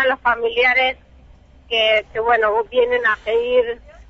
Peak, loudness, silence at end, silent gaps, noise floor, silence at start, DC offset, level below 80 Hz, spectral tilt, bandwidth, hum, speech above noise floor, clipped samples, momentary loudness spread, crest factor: -4 dBFS; -17 LUFS; 0.05 s; none; -46 dBFS; 0 s; under 0.1%; -48 dBFS; -3.5 dB/octave; 6.6 kHz; none; 29 dB; under 0.1%; 6 LU; 14 dB